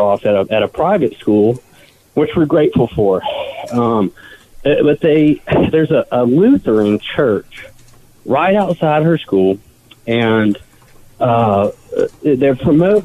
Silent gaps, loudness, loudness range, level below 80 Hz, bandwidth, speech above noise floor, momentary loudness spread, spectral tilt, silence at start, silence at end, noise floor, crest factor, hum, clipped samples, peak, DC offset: none; -14 LUFS; 3 LU; -42 dBFS; 13.5 kHz; 30 dB; 9 LU; -8 dB/octave; 0 s; 0 s; -43 dBFS; 10 dB; none; under 0.1%; -4 dBFS; under 0.1%